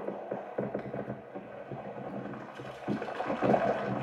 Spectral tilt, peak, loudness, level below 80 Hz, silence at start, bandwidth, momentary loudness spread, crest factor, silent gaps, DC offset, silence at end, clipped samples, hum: -8 dB/octave; -12 dBFS; -35 LUFS; -66 dBFS; 0 s; 11 kHz; 15 LU; 22 dB; none; under 0.1%; 0 s; under 0.1%; none